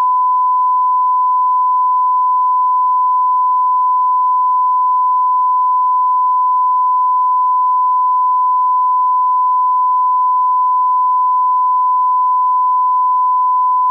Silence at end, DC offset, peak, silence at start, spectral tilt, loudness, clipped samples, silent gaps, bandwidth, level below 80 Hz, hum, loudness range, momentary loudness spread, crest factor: 0 s; under 0.1%; -10 dBFS; 0 s; 0 dB/octave; -13 LUFS; under 0.1%; none; 1.2 kHz; under -90 dBFS; none; 0 LU; 0 LU; 4 dB